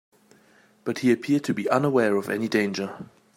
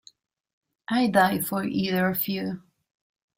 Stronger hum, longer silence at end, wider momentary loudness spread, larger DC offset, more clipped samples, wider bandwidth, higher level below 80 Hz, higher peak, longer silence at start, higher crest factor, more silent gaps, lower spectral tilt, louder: neither; second, 0.3 s vs 0.8 s; about the same, 12 LU vs 13 LU; neither; neither; about the same, 16 kHz vs 16.5 kHz; second, -72 dBFS vs -64 dBFS; about the same, -6 dBFS vs -8 dBFS; about the same, 0.85 s vs 0.9 s; about the same, 18 dB vs 20 dB; neither; about the same, -6 dB/octave vs -5 dB/octave; about the same, -24 LUFS vs -25 LUFS